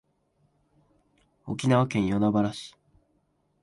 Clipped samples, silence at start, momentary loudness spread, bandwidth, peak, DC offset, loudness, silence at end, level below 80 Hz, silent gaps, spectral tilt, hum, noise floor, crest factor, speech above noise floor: under 0.1%; 1.45 s; 20 LU; 11.5 kHz; -10 dBFS; under 0.1%; -26 LUFS; 0.95 s; -58 dBFS; none; -7 dB/octave; none; -71 dBFS; 20 dB; 46 dB